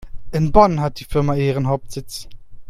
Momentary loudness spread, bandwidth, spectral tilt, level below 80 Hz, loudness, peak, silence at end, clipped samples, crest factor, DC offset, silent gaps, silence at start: 17 LU; 15 kHz; -7 dB/octave; -32 dBFS; -18 LUFS; 0 dBFS; 0 s; under 0.1%; 18 dB; under 0.1%; none; 0 s